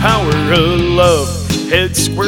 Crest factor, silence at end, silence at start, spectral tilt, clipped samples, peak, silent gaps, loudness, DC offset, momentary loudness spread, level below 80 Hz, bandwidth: 12 dB; 0 s; 0 s; -4.5 dB/octave; under 0.1%; 0 dBFS; none; -12 LUFS; under 0.1%; 5 LU; -26 dBFS; 17.5 kHz